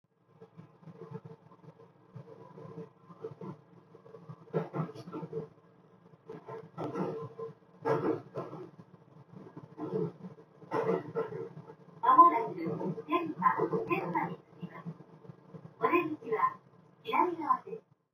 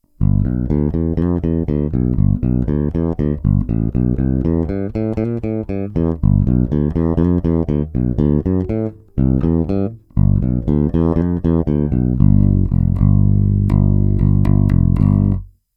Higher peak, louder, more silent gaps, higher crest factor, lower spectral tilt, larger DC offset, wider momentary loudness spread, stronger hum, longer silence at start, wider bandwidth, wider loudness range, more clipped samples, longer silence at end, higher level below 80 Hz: second, -8 dBFS vs 0 dBFS; second, -32 LUFS vs -17 LUFS; neither; first, 26 dB vs 14 dB; second, -8.5 dB/octave vs -12.5 dB/octave; neither; first, 22 LU vs 6 LU; neither; first, 0.4 s vs 0.2 s; first, 18 kHz vs 3.4 kHz; first, 20 LU vs 4 LU; neither; about the same, 0.35 s vs 0.3 s; second, -82 dBFS vs -24 dBFS